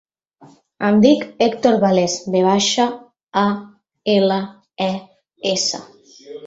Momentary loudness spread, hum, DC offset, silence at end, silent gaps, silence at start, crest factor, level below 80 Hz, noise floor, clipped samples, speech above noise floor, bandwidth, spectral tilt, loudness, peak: 14 LU; none; under 0.1%; 0 s; none; 0.8 s; 18 dB; -60 dBFS; -49 dBFS; under 0.1%; 32 dB; 8 kHz; -4.5 dB/octave; -18 LUFS; -2 dBFS